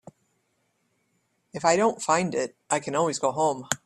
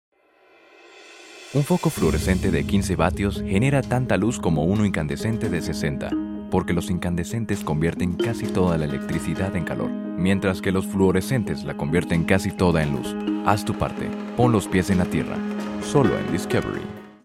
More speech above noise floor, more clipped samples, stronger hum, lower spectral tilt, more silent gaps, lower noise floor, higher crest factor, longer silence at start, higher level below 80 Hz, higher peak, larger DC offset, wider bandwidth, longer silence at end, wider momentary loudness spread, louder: first, 48 dB vs 34 dB; neither; neither; second, -3.5 dB/octave vs -6.5 dB/octave; neither; first, -73 dBFS vs -56 dBFS; about the same, 22 dB vs 20 dB; first, 1.55 s vs 0.85 s; second, -68 dBFS vs -40 dBFS; about the same, -4 dBFS vs -2 dBFS; neither; second, 14 kHz vs 16 kHz; about the same, 0.1 s vs 0.15 s; about the same, 7 LU vs 7 LU; about the same, -25 LUFS vs -23 LUFS